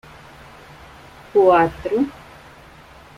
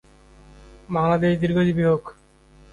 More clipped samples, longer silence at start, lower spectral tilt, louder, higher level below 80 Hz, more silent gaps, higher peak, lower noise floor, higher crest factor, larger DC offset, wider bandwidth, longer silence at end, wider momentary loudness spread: neither; first, 1.35 s vs 0.9 s; second, -7 dB/octave vs -8.5 dB/octave; first, -18 LUFS vs -21 LUFS; about the same, -50 dBFS vs -48 dBFS; neither; first, -4 dBFS vs -8 dBFS; second, -44 dBFS vs -52 dBFS; about the same, 18 dB vs 16 dB; neither; first, 13 kHz vs 7.2 kHz; first, 1.05 s vs 0.6 s; first, 11 LU vs 8 LU